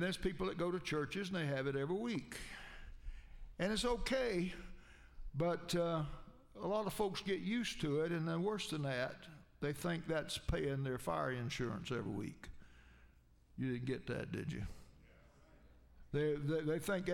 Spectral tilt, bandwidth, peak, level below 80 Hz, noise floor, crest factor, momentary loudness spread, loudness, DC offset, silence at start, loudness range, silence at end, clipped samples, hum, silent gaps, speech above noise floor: -5.5 dB/octave; 16 kHz; -24 dBFS; -54 dBFS; -66 dBFS; 18 dB; 18 LU; -40 LUFS; under 0.1%; 0 s; 5 LU; 0 s; under 0.1%; none; none; 27 dB